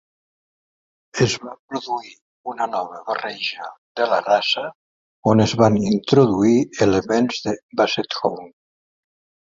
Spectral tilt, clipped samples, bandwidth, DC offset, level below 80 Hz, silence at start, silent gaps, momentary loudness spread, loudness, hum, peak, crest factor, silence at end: -5.5 dB/octave; under 0.1%; 7.8 kHz; under 0.1%; -52 dBFS; 1.15 s; 1.59-1.68 s, 2.22-2.44 s, 3.78-3.95 s, 4.75-5.23 s, 7.63-7.69 s; 15 LU; -20 LUFS; none; -2 dBFS; 20 dB; 0.95 s